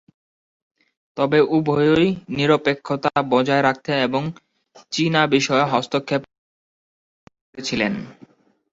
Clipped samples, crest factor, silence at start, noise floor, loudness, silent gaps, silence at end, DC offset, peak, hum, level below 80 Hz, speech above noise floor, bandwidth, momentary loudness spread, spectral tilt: under 0.1%; 18 dB; 1.15 s; under -90 dBFS; -20 LUFS; 6.38-7.27 s, 7.41-7.53 s; 0.6 s; under 0.1%; -2 dBFS; none; -58 dBFS; over 71 dB; 7.8 kHz; 10 LU; -5.5 dB/octave